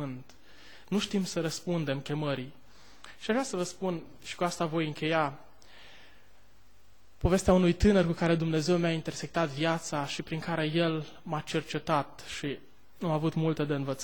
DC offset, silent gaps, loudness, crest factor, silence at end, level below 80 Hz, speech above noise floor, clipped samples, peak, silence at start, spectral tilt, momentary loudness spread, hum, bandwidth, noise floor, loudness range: 0.4%; none; -30 LUFS; 18 dB; 0 s; -48 dBFS; 33 dB; under 0.1%; -12 dBFS; 0 s; -5.5 dB/octave; 13 LU; none; 19 kHz; -63 dBFS; 7 LU